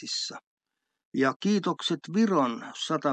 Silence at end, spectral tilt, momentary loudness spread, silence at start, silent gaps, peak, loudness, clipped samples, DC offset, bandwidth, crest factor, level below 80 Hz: 0 s; -4.5 dB/octave; 11 LU; 0 s; 0.47-0.57 s, 1.05-1.12 s, 1.36-1.40 s; -12 dBFS; -28 LUFS; under 0.1%; under 0.1%; 9 kHz; 18 dB; -84 dBFS